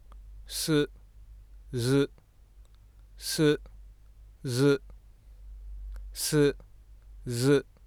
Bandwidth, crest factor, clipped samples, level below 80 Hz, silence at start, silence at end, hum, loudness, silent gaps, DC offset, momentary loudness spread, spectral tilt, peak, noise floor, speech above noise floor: 20 kHz; 18 dB; under 0.1%; -48 dBFS; 0.1 s; 0.25 s; none; -28 LUFS; none; under 0.1%; 20 LU; -5 dB/octave; -12 dBFS; -55 dBFS; 29 dB